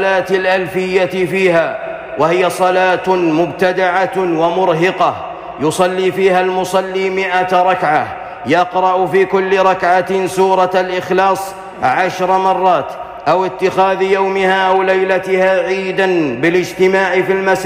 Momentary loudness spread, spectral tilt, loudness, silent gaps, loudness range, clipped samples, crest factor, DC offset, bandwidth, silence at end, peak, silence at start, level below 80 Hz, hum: 5 LU; -5 dB/octave; -14 LUFS; none; 1 LU; under 0.1%; 10 dB; under 0.1%; 15.5 kHz; 0 s; -2 dBFS; 0 s; -52 dBFS; none